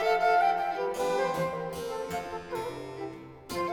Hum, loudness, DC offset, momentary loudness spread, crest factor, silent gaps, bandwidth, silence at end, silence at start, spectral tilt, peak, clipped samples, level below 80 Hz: none; -30 LUFS; under 0.1%; 15 LU; 16 dB; none; 19 kHz; 0 s; 0 s; -4.5 dB/octave; -14 dBFS; under 0.1%; -60 dBFS